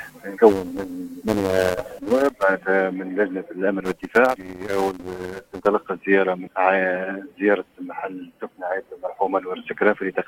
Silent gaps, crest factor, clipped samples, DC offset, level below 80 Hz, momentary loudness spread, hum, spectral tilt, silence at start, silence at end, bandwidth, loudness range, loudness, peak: none; 22 dB; under 0.1%; under 0.1%; -56 dBFS; 14 LU; none; -6 dB/octave; 0 s; 0.05 s; 17 kHz; 3 LU; -22 LUFS; 0 dBFS